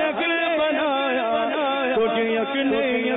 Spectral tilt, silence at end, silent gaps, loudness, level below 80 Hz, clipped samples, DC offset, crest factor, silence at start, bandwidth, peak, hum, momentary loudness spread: -8.5 dB/octave; 0 s; none; -22 LUFS; -60 dBFS; under 0.1%; under 0.1%; 10 dB; 0 s; 4 kHz; -12 dBFS; none; 2 LU